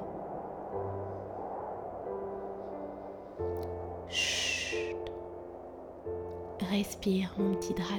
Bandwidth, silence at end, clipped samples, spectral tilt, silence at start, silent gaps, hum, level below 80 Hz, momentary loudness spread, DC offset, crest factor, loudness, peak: 20 kHz; 0 s; under 0.1%; -4 dB/octave; 0 s; none; none; -60 dBFS; 13 LU; under 0.1%; 18 dB; -36 LUFS; -18 dBFS